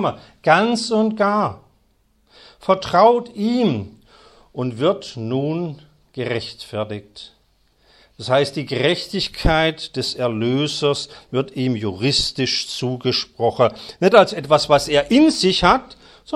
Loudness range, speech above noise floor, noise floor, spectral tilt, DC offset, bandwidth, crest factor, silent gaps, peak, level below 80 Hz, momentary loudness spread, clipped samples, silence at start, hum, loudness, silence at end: 9 LU; 42 dB; -61 dBFS; -5 dB/octave; under 0.1%; 14 kHz; 20 dB; none; 0 dBFS; -40 dBFS; 13 LU; under 0.1%; 0 s; none; -19 LUFS; 0 s